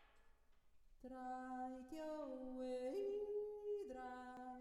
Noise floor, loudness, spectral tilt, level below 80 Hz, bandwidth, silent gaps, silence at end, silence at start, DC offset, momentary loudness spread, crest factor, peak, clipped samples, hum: -70 dBFS; -49 LUFS; -5 dB/octave; -72 dBFS; 13 kHz; none; 0 s; 0 s; under 0.1%; 9 LU; 12 dB; -38 dBFS; under 0.1%; none